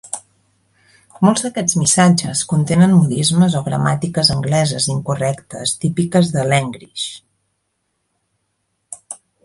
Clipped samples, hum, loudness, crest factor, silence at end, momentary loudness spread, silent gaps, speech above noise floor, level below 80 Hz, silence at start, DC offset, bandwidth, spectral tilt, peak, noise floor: under 0.1%; none; -16 LUFS; 16 dB; 0.3 s; 15 LU; none; 55 dB; -50 dBFS; 0.05 s; under 0.1%; 11.5 kHz; -4.5 dB/octave; 0 dBFS; -70 dBFS